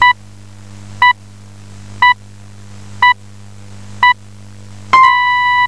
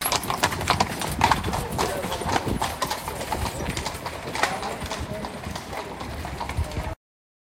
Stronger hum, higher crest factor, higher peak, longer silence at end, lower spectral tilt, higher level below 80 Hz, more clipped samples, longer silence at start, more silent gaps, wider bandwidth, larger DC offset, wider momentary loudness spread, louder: first, 50 Hz at -35 dBFS vs none; second, 14 dB vs 24 dB; about the same, 0 dBFS vs -2 dBFS; second, 0 s vs 0.55 s; about the same, -2.5 dB/octave vs -3.5 dB/octave; second, -50 dBFS vs -38 dBFS; neither; about the same, 0 s vs 0 s; neither; second, 11 kHz vs 17 kHz; first, 1% vs under 0.1%; about the same, 11 LU vs 10 LU; first, -11 LUFS vs -27 LUFS